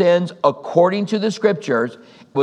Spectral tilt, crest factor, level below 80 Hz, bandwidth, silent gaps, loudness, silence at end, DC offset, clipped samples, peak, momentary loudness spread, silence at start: -6 dB/octave; 18 dB; -76 dBFS; 9.8 kHz; none; -19 LUFS; 0 s; under 0.1%; under 0.1%; 0 dBFS; 5 LU; 0 s